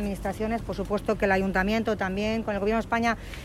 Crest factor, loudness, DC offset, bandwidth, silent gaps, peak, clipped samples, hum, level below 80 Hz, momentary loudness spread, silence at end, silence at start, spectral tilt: 16 dB; -27 LUFS; under 0.1%; 15 kHz; none; -10 dBFS; under 0.1%; none; -40 dBFS; 6 LU; 0 s; 0 s; -6 dB/octave